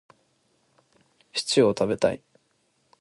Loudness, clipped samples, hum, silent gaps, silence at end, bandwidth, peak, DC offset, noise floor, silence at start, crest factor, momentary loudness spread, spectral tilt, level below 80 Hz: -24 LUFS; under 0.1%; none; none; 0.85 s; 11.5 kHz; -6 dBFS; under 0.1%; -69 dBFS; 1.35 s; 22 dB; 11 LU; -4.5 dB/octave; -60 dBFS